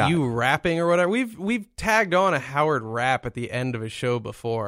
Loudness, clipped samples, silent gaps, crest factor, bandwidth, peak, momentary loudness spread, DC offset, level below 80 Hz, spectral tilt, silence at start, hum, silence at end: -23 LUFS; under 0.1%; none; 18 dB; 16 kHz; -6 dBFS; 8 LU; under 0.1%; -50 dBFS; -5.5 dB/octave; 0 s; none; 0 s